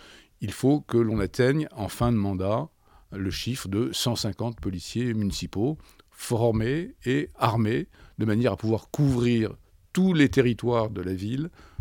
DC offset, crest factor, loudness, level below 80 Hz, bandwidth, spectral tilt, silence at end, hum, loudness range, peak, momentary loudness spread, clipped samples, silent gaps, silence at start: under 0.1%; 20 dB; -26 LUFS; -48 dBFS; 18 kHz; -6.5 dB/octave; 0.2 s; none; 4 LU; -6 dBFS; 9 LU; under 0.1%; none; 0.05 s